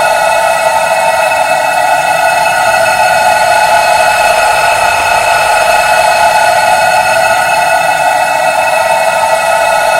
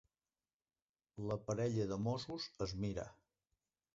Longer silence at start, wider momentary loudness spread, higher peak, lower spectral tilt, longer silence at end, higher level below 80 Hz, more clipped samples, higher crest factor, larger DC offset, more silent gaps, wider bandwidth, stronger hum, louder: second, 0 s vs 1.15 s; second, 2 LU vs 10 LU; first, 0 dBFS vs -26 dBFS; second, -1 dB/octave vs -6.5 dB/octave; second, 0 s vs 0.8 s; first, -42 dBFS vs -64 dBFS; first, 0.6% vs under 0.1%; second, 8 dB vs 18 dB; neither; neither; first, 16.5 kHz vs 7.6 kHz; neither; first, -8 LUFS vs -42 LUFS